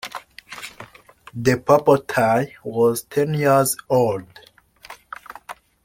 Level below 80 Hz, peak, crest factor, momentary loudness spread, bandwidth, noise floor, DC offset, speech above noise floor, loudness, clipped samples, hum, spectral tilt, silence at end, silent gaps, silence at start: -56 dBFS; -2 dBFS; 20 dB; 21 LU; 16.5 kHz; -47 dBFS; under 0.1%; 29 dB; -19 LUFS; under 0.1%; none; -5.5 dB/octave; 0.3 s; none; 0.05 s